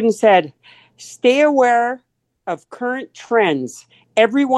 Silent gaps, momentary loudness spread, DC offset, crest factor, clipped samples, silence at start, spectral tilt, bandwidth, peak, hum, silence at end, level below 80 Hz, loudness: none; 18 LU; under 0.1%; 16 dB; under 0.1%; 0 s; -4.5 dB/octave; 12.5 kHz; 0 dBFS; none; 0 s; -72 dBFS; -17 LUFS